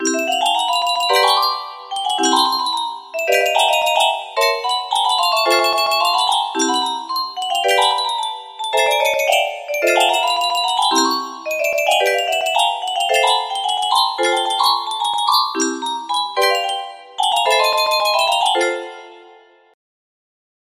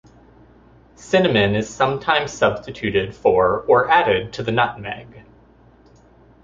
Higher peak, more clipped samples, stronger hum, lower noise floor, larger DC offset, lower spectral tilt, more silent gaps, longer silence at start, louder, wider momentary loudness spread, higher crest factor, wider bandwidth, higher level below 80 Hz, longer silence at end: about the same, -2 dBFS vs -2 dBFS; neither; neither; about the same, -47 dBFS vs -50 dBFS; neither; second, 1 dB/octave vs -5 dB/octave; neither; second, 0 s vs 1 s; about the same, -16 LUFS vs -18 LUFS; about the same, 7 LU vs 7 LU; about the same, 16 dB vs 18 dB; first, 16 kHz vs 7.8 kHz; second, -68 dBFS vs -48 dBFS; first, 1.5 s vs 1.25 s